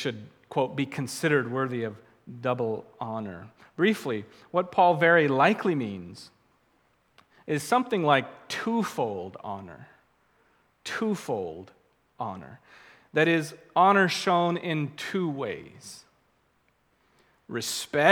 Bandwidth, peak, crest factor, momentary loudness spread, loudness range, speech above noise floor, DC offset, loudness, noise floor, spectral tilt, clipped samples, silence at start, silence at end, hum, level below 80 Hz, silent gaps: 19 kHz; -2 dBFS; 26 dB; 21 LU; 10 LU; 42 dB; under 0.1%; -27 LUFS; -69 dBFS; -5 dB/octave; under 0.1%; 0 s; 0 s; none; -72 dBFS; none